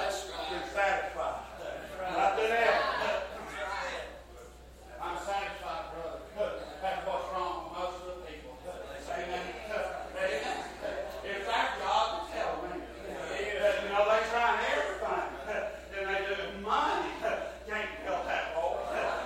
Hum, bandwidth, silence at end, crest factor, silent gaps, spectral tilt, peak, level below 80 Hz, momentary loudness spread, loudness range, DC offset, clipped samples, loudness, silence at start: none; 16 kHz; 0 s; 20 dB; none; -3 dB/octave; -14 dBFS; -54 dBFS; 13 LU; 7 LU; under 0.1%; under 0.1%; -33 LUFS; 0 s